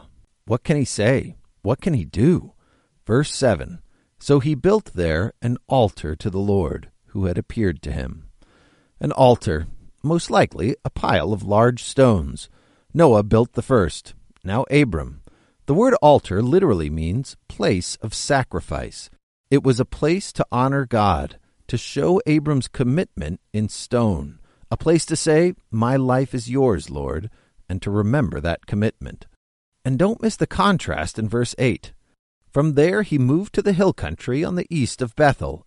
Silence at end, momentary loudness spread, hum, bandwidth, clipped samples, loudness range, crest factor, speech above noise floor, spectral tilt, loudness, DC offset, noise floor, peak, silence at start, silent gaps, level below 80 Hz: 0.1 s; 12 LU; none; 11.5 kHz; under 0.1%; 4 LU; 18 dB; 40 dB; -6.5 dB/octave; -20 LUFS; under 0.1%; -60 dBFS; -2 dBFS; 0.45 s; 19.23-19.44 s, 29.36-29.72 s, 32.19-32.41 s; -38 dBFS